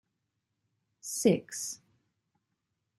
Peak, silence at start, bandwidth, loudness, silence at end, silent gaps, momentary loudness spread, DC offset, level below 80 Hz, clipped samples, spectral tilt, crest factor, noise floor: -12 dBFS; 1.05 s; 13 kHz; -31 LUFS; 1.2 s; none; 18 LU; under 0.1%; -76 dBFS; under 0.1%; -4.5 dB/octave; 24 dB; -83 dBFS